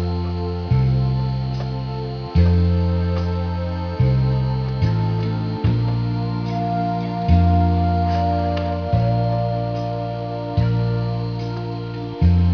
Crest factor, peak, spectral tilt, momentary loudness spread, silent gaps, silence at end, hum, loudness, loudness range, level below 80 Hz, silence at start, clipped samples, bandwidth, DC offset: 14 dB; -4 dBFS; -9.5 dB/octave; 8 LU; none; 0 s; none; -21 LUFS; 2 LU; -30 dBFS; 0 s; under 0.1%; 5.4 kHz; under 0.1%